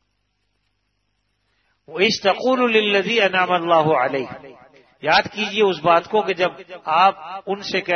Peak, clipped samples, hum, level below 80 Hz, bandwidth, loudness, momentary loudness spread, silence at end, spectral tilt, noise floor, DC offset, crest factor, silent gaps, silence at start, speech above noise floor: -2 dBFS; under 0.1%; 50 Hz at -50 dBFS; -64 dBFS; 6.6 kHz; -18 LUFS; 11 LU; 0 s; -4.5 dB/octave; -71 dBFS; under 0.1%; 18 dB; none; 1.9 s; 52 dB